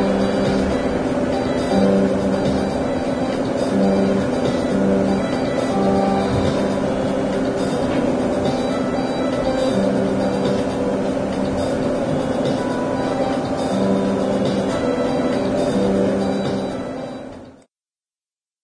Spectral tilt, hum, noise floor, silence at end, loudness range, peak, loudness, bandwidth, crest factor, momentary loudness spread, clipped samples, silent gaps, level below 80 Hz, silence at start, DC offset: -6.5 dB/octave; none; under -90 dBFS; 1.1 s; 2 LU; -4 dBFS; -20 LUFS; 11 kHz; 16 dB; 4 LU; under 0.1%; none; -40 dBFS; 0 s; under 0.1%